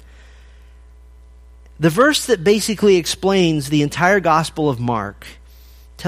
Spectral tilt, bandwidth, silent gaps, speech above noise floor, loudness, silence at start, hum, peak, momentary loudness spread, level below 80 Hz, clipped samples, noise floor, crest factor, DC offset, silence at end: -4.5 dB/octave; 15.5 kHz; none; 27 dB; -16 LUFS; 1.8 s; none; 0 dBFS; 8 LU; -44 dBFS; under 0.1%; -43 dBFS; 18 dB; under 0.1%; 0 s